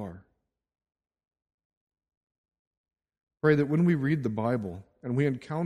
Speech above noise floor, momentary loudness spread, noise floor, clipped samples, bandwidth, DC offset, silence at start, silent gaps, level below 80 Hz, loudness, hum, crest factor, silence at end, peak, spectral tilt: 50 dB; 15 LU; -76 dBFS; under 0.1%; 9 kHz; under 0.1%; 0 s; 1.54-1.58 s, 1.65-1.70 s, 1.77-1.87 s, 2.17-2.27 s, 2.38-2.44 s, 2.59-2.71 s, 2.77-2.84 s, 3.23-3.27 s; -64 dBFS; -27 LUFS; none; 22 dB; 0 s; -8 dBFS; -9 dB/octave